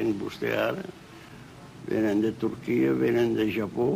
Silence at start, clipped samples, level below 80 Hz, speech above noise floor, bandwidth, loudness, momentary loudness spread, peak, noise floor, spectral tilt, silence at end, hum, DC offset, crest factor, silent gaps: 0 s; under 0.1%; -60 dBFS; 20 dB; 15.5 kHz; -27 LUFS; 22 LU; -12 dBFS; -46 dBFS; -7 dB/octave; 0 s; none; under 0.1%; 14 dB; none